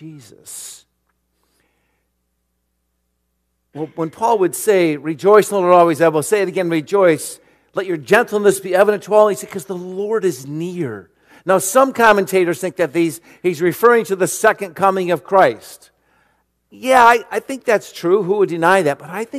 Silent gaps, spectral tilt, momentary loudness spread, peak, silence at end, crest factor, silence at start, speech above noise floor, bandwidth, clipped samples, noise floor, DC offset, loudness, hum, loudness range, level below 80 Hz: none; -4.5 dB/octave; 15 LU; 0 dBFS; 0 s; 16 dB; 0 s; 54 dB; 15 kHz; 0.1%; -69 dBFS; under 0.1%; -16 LUFS; none; 3 LU; -62 dBFS